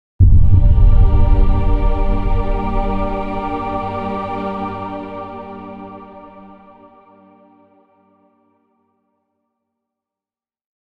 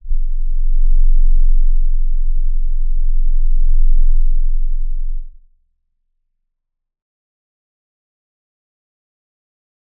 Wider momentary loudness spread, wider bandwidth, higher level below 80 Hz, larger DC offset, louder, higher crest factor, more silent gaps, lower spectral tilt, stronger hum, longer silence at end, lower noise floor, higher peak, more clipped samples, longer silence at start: first, 20 LU vs 7 LU; first, 4.2 kHz vs 0.1 kHz; about the same, -18 dBFS vs -14 dBFS; neither; first, -18 LUFS vs -22 LUFS; about the same, 14 dB vs 10 dB; neither; second, -10 dB/octave vs -15 dB/octave; neither; about the same, 4.6 s vs 4.7 s; first, under -90 dBFS vs -75 dBFS; about the same, 0 dBFS vs -2 dBFS; neither; first, 0.2 s vs 0.05 s